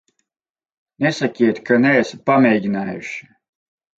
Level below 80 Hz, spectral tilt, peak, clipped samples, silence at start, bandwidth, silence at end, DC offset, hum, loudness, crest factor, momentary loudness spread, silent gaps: -64 dBFS; -6.5 dB/octave; -2 dBFS; under 0.1%; 1 s; 8 kHz; 0.8 s; under 0.1%; none; -17 LUFS; 16 dB; 13 LU; none